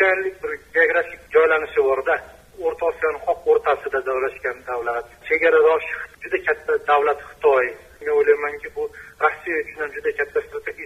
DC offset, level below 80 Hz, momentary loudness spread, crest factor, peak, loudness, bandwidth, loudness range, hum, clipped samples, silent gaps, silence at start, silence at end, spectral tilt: under 0.1%; -54 dBFS; 11 LU; 18 dB; -4 dBFS; -21 LUFS; 12.5 kHz; 3 LU; none; under 0.1%; none; 0 s; 0 s; -4.5 dB/octave